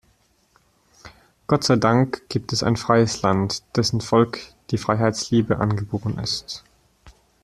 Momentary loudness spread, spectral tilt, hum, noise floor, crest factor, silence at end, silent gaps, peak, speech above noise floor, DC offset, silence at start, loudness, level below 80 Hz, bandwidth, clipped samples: 10 LU; -5.5 dB/octave; none; -62 dBFS; 20 dB; 0.35 s; none; -2 dBFS; 41 dB; under 0.1%; 1.05 s; -21 LUFS; -50 dBFS; 13 kHz; under 0.1%